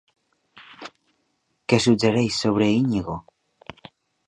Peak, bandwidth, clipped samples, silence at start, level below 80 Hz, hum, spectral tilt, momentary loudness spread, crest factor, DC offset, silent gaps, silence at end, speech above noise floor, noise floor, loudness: -2 dBFS; 11 kHz; under 0.1%; 0.55 s; -54 dBFS; none; -5.5 dB/octave; 23 LU; 22 dB; under 0.1%; none; 1.1 s; 51 dB; -71 dBFS; -21 LUFS